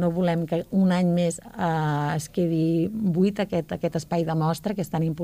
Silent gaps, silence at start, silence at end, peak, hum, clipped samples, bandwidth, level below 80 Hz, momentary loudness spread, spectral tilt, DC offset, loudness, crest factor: none; 0 s; 0 s; -12 dBFS; none; under 0.1%; 15.5 kHz; -54 dBFS; 6 LU; -7 dB/octave; under 0.1%; -25 LUFS; 12 dB